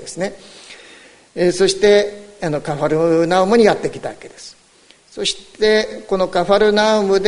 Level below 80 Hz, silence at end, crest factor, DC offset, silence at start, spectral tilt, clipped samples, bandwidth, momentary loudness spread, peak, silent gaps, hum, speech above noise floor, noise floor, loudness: -46 dBFS; 0 s; 16 dB; under 0.1%; 0 s; -4.5 dB/octave; under 0.1%; 11 kHz; 22 LU; 0 dBFS; none; none; 34 dB; -50 dBFS; -16 LUFS